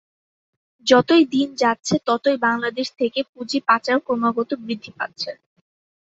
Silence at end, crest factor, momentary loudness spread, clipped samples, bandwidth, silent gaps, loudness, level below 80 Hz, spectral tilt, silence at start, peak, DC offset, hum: 0.8 s; 20 dB; 11 LU; under 0.1%; 8 kHz; 3.29-3.33 s; -20 LUFS; -64 dBFS; -4 dB/octave; 0.85 s; -2 dBFS; under 0.1%; none